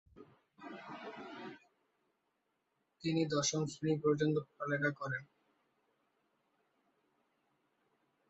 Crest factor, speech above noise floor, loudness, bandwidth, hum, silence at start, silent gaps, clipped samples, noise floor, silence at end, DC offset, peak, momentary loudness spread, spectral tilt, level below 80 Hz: 20 dB; 48 dB; -36 LUFS; 8 kHz; none; 0.15 s; none; under 0.1%; -83 dBFS; 3.05 s; under 0.1%; -20 dBFS; 18 LU; -5 dB/octave; -78 dBFS